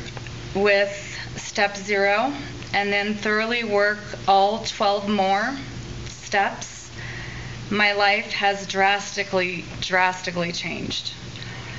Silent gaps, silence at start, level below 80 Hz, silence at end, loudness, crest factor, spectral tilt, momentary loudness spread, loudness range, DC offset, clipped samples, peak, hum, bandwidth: none; 0 s; -48 dBFS; 0 s; -22 LUFS; 20 dB; -2 dB/octave; 15 LU; 2 LU; 0.4%; under 0.1%; -4 dBFS; none; 8 kHz